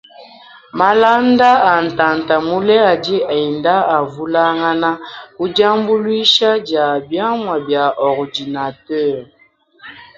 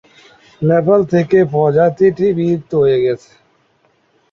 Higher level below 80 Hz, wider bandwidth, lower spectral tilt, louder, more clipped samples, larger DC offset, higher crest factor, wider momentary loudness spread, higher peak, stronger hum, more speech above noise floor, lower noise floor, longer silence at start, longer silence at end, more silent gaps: about the same, -56 dBFS vs -52 dBFS; about the same, 7.6 kHz vs 7 kHz; second, -5 dB/octave vs -9 dB/octave; about the same, -14 LUFS vs -14 LUFS; neither; neither; about the same, 14 dB vs 14 dB; first, 11 LU vs 6 LU; about the same, 0 dBFS vs -2 dBFS; neither; second, 33 dB vs 45 dB; second, -47 dBFS vs -58 dBFS; second, 0.2 s vs 0.6 s; second, 0.15 s vs 1.15 s; neither